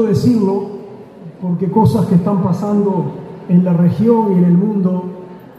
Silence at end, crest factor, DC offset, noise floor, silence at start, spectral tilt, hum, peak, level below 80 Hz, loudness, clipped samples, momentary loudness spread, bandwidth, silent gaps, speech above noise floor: 0.15 s; 14 dB; under 0.1%; -34 dBFS; 0 s; -9.5 dB/octave; none; 0 dBFS; -48 dBFS; -14 LUFS; under 0.1%; 17 LU; 11 kHz; none; 21 dB